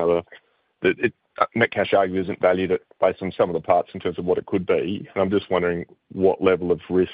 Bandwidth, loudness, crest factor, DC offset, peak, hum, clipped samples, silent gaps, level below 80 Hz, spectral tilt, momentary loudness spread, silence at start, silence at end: 5 kHz; -22 LUFS; 20 dB; under 0.1%; -2 dBFS; none; under 0.1%; none; -56 dBFS; -10.5 dB/octave; 6 LU; 0 s; 0 s